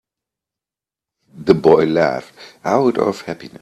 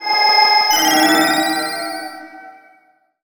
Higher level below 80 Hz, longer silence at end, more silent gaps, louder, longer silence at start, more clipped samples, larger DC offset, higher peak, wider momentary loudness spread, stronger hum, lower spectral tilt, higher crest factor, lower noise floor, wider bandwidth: first, -54 dBFS vs -66 dBFS; second, 0.05 s vs 0.7 s; neither; second, -16 LUFS vs -13 LUFS; first, 1.35 s vs 0 s; neither; neither; about the same, 0 dBFS vs -2 dBFS; about the same, 16 LU vs 17 LU; neither; first, -7 dB/octave vs -0.5 dB/octave; about the same, 18 dB vs 16 dB; first, -89 dBFS vs -56 dBFS; second, 12 kHz vs over 20 kHz